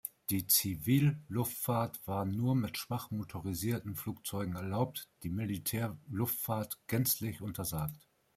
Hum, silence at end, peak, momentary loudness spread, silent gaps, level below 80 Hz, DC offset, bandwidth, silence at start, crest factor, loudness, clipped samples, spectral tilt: none; 0.4 s; -16 dBFS; 10 LU; none; -64 dBFS; under 0.1%; 16 kHz; 0.05 s; 20 dB; -35 LUFS; under 0.1%; -5 dB/octave